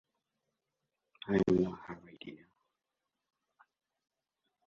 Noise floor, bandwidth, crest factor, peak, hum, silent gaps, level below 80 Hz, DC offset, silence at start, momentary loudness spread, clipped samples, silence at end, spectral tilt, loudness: -88 dBFS; 7.4 kHz; 22 dB; -18 dBFS; none; none; -66 dBFS; under 0.1%; 1.25 s; 21 LU; under 0.1%; 2.3 s; -8 dB/octave; -32 LUFS